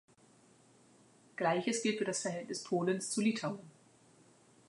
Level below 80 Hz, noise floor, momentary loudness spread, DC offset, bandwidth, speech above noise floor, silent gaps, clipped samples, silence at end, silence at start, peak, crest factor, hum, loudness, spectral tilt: -86 dBFS; -65 dBFS; 9 LU; under 0.1%; 11.5 kHz; 30 dB; none; under 0.1%; 1 s; 1.4 s; -20 dBFS; 18 dB; none; -35 LUFS; -4 dB/octave